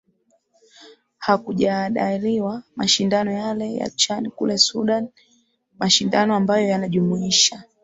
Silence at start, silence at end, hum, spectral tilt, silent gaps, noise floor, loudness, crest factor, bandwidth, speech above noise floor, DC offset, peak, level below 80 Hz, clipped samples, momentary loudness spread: 0.8 s; 0.2 s; none; -3.5 dB/octave; none; -65 dBFS; -20 LUFS; 20 dB; 8.2 kHz; 44 dB; under 0.1%; -2 dBFS; -60 dBFS; under 0.1%; 9 LU